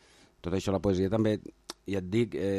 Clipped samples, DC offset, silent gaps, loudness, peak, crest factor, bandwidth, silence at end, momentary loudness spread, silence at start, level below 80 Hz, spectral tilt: under 0.1%; under 0.1%; none; -30 LUFS; -14 dBFS; 16 dB; 13.5 kHz; 0 s; 15 LU; 0.45 s; -54 dBFS; -7 dB/octave